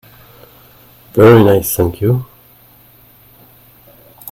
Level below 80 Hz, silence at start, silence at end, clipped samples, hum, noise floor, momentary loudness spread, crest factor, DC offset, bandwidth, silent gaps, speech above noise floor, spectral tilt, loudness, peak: -44 dBFS; 1.15 s; 2.1 s; 0.3%; none; -45 dBFS; 21 LU; 16 dB; under 0.1%; 17 kHz; none; 36 dB; -6.5 dB/octave; -11 LUFS; 0 dBFS